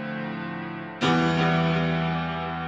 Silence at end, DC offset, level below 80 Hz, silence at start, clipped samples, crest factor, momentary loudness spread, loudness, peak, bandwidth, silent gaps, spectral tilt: 0 s; under 0.1%; -50 dBFS; 0 s; under 0.1%; 16 dB; 11 LU; -25 LUFS; -10 dBFS; 7.6 kHz; none; -6.5 dB/octave